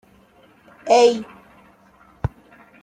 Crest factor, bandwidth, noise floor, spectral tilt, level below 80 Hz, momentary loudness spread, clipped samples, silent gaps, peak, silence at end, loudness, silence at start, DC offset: 20 dB; 10 kHz; -53 dBFS; -4.5 dB/octave; -46 dBFS; 21 LU; under 0.1%; none; -4 dBFS; 0.55 s; -19 LUFS; 0.85 s; under 0.1%